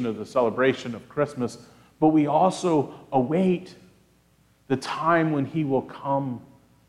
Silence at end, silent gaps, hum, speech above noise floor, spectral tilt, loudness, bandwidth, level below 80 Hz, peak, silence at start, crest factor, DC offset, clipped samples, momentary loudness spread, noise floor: 0.5 s; none; none; 37 dB; -7 dB/octave; -24 LUFS; 11.5 kHz; -64 dBFS; -8 dBFS; 0 s; 18 dB; under 0.1%; under 0.1%; 11 LU; -61 dBFS